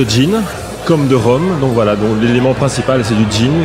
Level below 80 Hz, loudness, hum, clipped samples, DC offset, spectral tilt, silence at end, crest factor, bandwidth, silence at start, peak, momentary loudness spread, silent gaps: -34 dBFS; -13 LUFS; none; under 0.1%; under 0.1%; -6 dB/octave; 0 s; 10 dB; 16 kHz; 0 s; -2 dBFS; 4 LU; none